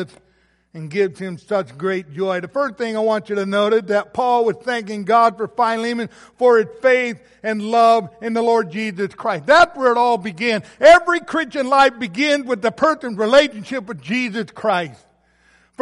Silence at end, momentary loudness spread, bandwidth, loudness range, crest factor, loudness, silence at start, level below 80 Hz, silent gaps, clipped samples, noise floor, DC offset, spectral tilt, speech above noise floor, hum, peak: 0.9 s; 11 LU; 11.5 kHz; 5 LU; 16 dB; -18 LUFS; 0 s; -56 dBFS; none; under 0.1%; -57 dBFS; under 0.1%; -4.5 dB/octave; 39 dB; none; -2 dBFS